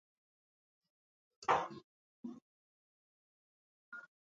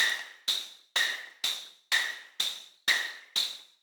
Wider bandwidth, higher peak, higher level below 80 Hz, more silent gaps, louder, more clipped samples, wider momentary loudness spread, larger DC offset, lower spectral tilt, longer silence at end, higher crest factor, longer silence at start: second, 7.4 kHz vs over 20 kHz; second, -18 dBFS vs -12 dBFS; first, -82 dBFS vs under -90 dBFS; first, 1.84-2.23 s, 2.42-3.92 s vs none; second, -37 LUFS vs -30 LUFS; neither; first, 20 LU vs 5 LU; neither; first, -2.5 dB/octave vs 3.5 dB/octave; about the same, 0.3 s vs 0.2 s; first, 28 dB vs 20 dB; first, 1.4 s vs 0 s